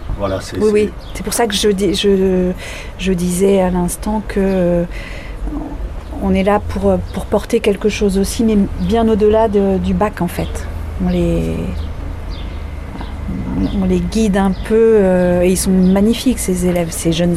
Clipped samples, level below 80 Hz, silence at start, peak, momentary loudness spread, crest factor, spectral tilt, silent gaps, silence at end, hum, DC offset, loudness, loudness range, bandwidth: under 0.1%; -26 dBFS; 0 s; -2 dBFS; 14 LU; 12 dB; -6 dB/octave; none; 0 s; none; under 0.1%; -15 LUFS; 6 LU; 15.5 kHz